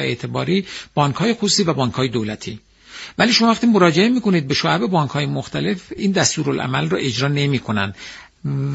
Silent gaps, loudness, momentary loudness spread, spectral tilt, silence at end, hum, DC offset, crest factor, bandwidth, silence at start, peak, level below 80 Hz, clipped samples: none; -18 LUFS; 15 LU; -4.5 dB/octave; 0 s; none; under 0.1%; 18 dB; 8 kHz; 0 s; 0 dBFS; -52 dBFS; under 0.1%